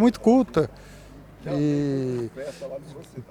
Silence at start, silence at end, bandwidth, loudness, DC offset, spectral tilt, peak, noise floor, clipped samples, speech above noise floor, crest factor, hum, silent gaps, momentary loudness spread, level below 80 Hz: 0 s; 0.05 s; 12.5 kHz; -24 LUFS; under 0.1%; -7.5 dB/octave; -8 dBFS; -45 dBFS; under 0.1%; 21 dB; 18 dB; none; none; 20 LU; -52 dBFS